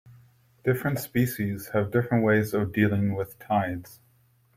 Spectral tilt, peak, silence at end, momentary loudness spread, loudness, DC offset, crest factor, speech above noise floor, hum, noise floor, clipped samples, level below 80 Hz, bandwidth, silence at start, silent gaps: -7 dB/octave; -8 dBFS; 0.6 s; 8 LU; -26 LUFS; under 0.1%; 18 dB; 38 dB; none; -63 dBFS; under 0.1%; -60 dBFS; 16.5 kHz; 0.05 s; none